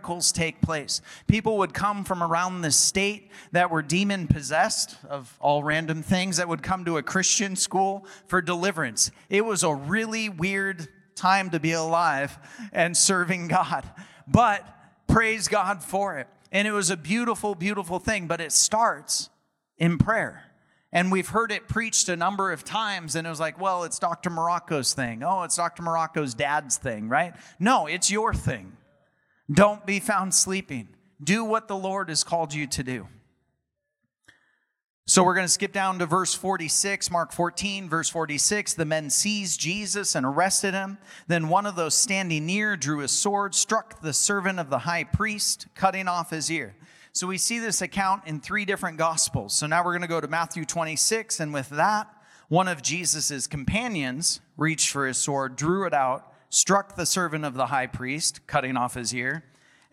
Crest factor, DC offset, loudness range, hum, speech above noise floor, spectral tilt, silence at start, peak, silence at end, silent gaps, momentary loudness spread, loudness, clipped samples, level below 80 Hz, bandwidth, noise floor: 22 dB; under 0.1%; 3 LU; none; 55 dB; -3 dB/octave; 0.05 s; -4 dBFS; 0.5 s; 34.90-35.03 s; 8 LU; -24 LUFS; under 0.1%; -52 dBFS; 16 kHz; -80 dBFS